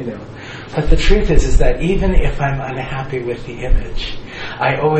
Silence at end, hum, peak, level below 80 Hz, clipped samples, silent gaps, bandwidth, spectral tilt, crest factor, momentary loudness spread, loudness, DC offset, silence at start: 0 s; none; 0 dBFS; -16 dBFS; under 0.1%; none; 8.4 kHz; -6 dB/octave; 14 dB; 12 LU; -19 LUFS; under 0.1%; 0 s